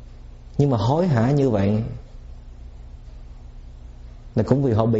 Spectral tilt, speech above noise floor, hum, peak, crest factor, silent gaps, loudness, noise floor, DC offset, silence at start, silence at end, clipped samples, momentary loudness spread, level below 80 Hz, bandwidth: -8.5 dB/octave; 21 dB; 60 Hz at -45 dBFS; -6 dBFS; 16 dB; none; -21 LUFS; -40 dBFS; under 0.1%; 0 s; 0 s; under 0.1%; 25 LU; -40 dBFS; 7.8 kHz